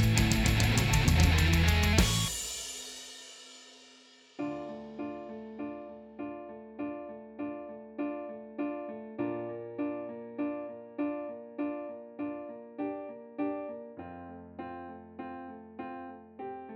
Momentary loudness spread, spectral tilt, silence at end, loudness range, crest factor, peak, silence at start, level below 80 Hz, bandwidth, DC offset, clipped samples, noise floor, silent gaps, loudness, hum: 20 LU; -4.5 dB/octave; 0 s; 14 LU; 22 dB; -10 dBFS; 0 s; -40 dBFS; 20 kHz; under 0.1%; under 0.1%; -58 dBFS; none; -33 LUFS; none